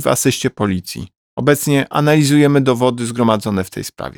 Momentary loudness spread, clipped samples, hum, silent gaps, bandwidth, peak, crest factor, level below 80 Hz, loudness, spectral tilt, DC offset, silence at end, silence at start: 14 LU; under 0.1%; none; 1.17-1.37 s; over 20 kHz; 0 dBFS; 14 dB; -50 dBFS; -15 LUFS; -5.5 dB/octave; under 0.1%; 0.05 s; 0 s